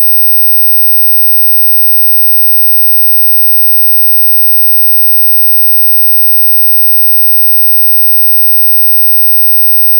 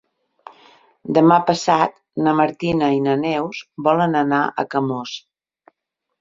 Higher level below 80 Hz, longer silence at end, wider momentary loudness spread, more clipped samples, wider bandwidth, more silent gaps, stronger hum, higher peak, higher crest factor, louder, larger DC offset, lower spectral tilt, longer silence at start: second, under -90 dBFS vs -58 dBFS; second, 0 s vs 1.05 s; second, 0 LU vs 12 LU; neither; first, 17.5 kHz vs 7.8 kHz; neither; neither; about the same, -2 dBFS vs -2 dBFS; second, 4 dB vs 18 dB; first, -2 LUFS vs -18 LUFS; neither; second, 0 dB/octave vs -6 dB/octave; second, 0 s vs 1.05 s